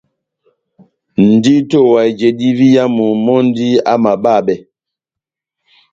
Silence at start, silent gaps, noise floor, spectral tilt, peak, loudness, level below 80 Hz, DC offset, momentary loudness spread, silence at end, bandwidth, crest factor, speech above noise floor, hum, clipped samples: 1.2 s; none; -84 dBFS; -7 dB/octave; 0 dBFS; -11 LUFS; -56 dBFS; under 0.1%; 4 LU; 1.35 s; 7.6 kHz; 12 dB; 74 dB; none; under 0.1%